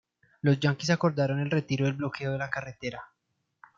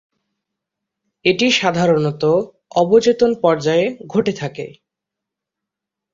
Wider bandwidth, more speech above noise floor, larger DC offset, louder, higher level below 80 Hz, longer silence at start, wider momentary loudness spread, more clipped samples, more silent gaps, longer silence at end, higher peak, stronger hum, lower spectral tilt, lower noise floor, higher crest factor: about the same, 7.6 kHz vs 7.6 kHz; second, 33 dB vs 67 dB; neither; second, -29 LUFS vs -16 LUFS; second, -66 dBFS vs -58 dBFS; second, 0.45 s vs 1.25 s; about the same, 12 LU vs 10 LU; neither; neither; second, 0.75 s vs 1.45 s; second, -10 dBFS vs -2 dBFS; neither; first, -6.5 dB/octave vs -5 dB/octave; second, -61 dBFS vs -83 dBFS; about the same, 18 dB vs 18 dB